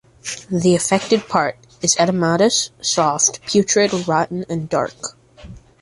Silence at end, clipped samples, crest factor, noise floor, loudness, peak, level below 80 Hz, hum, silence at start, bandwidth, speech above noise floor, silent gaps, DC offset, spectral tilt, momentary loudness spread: 0.25 s; under 0.1%; 18 dB; -40 dBFS; -17 LUFS; -2 dBFS; -52 dBFS; none; 0.25 s; 11.5 kHz; 22 dB; none; under 0.1%; -3.5 dB/octave; 10 LU